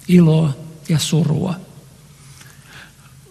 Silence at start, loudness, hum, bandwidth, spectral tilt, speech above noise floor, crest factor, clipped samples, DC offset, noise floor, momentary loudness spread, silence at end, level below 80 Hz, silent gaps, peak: 0.1 s; -17 LUFS; none; 13 kHz; -6.5 dB/octave; 29 dB; 18 dB; under 0.1%; under 0.1%; -44 dBFS; 27 LU; 0.45 s; -50 dBFS; none; 0 dBFS